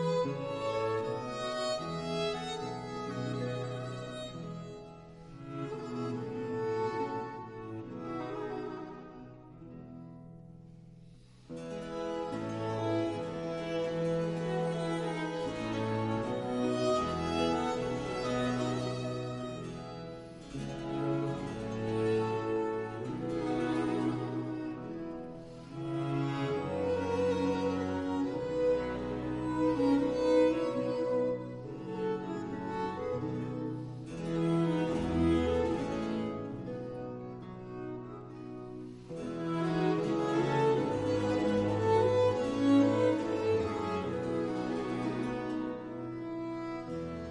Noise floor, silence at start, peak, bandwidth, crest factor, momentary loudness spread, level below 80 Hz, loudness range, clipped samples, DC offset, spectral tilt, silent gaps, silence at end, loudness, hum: -55 dBFS; 0 s; -16 dBFS; 11.5 kHz; 18 dB; 15 LU; -56 dBFS; 10 LU; under 0.1%; under 0.1%; -7 dB/octave; none; 0 s; -34 LUFS; none